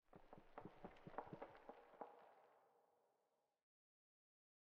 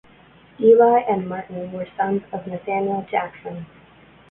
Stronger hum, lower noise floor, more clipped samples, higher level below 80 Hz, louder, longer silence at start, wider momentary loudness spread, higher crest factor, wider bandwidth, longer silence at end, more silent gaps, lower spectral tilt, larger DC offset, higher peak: neither; first, -88 dBFS vs -50 dBFS; neither; second, -80 dBFS vs -60 dBFS; second, -61 LUFS vs -20 LUFS; second, 0.05 s vs 0.6 s; second, 10 LU vs 17 LU; first, 28 dB vs 18 dB; first, 5.6 kHz vs 3.7 kHz; first, 1.55 s vs 0.65 s; neither; second, -5.5 dB/octave vs -11 dB/octave; neither; second, -36 dBFS vs -4 dBFS